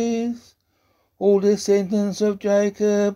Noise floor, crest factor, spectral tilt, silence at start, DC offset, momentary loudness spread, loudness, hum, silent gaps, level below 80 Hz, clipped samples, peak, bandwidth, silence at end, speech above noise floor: -66 dBFS; 14 dB; -6 dB/octave; 0 s; under 0.1%; 7 LU; -20 LUFS; none; none; -64 dBFS; under 0.1%; -6 dBFS; 13 kHz; 0 s; 47 dB